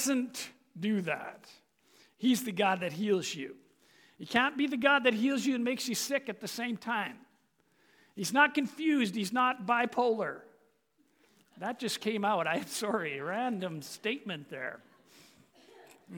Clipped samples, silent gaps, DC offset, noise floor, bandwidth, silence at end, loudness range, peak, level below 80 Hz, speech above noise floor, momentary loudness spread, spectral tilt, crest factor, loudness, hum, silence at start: under 0.1%; none; under 0.1%; -72 dBFS; 19.5 kHz; 0 s; 5 LU; -10 dBFS; -78 dBFS; 40 dB; 14 LU; -3.5 dB/octave; 22 dB; -31 LUFS; none; 0 s